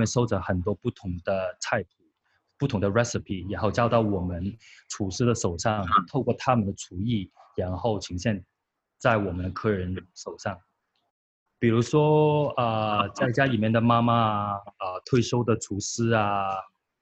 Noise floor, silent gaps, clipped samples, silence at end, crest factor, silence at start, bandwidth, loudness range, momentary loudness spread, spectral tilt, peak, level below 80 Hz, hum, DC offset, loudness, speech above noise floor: -72 dBFS; 11.10-11.46 s; under 0.1%; 0.35 s; 20 dB; 0 s; 8.4 kHz; 6 LU; 12 LU; -6 dB/octave; -6 dBFS; -52 dBFS; none; under 0.1%; -26 LUFS; 47 dB